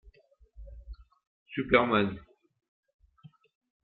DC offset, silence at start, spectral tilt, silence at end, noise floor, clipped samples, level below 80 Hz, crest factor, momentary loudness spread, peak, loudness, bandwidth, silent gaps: under 0.1%; 0.6 s; -3.5 dB/octave; 1.65 s; -60 dBFS; under 0.1%; -54 dBFS; 28 dB; 27 LU; -6 dBFS; -27 LUFS; 4.7 kHz; 1.27-1.46 s